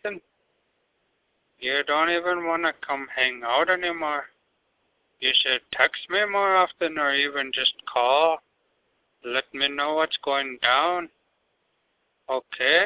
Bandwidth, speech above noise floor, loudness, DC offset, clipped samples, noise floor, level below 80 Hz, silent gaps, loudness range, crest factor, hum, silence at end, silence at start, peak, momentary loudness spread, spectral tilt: 4 kHz; 48 dB; -23 LUFS; under 0.1%; under 0.1%; -72 dBFS; -70 dBFS; none; 3 LU; 20 dB; none; 0 s; 0.05 s; -6 dBFS; 11 LU; -5.5 dB/octave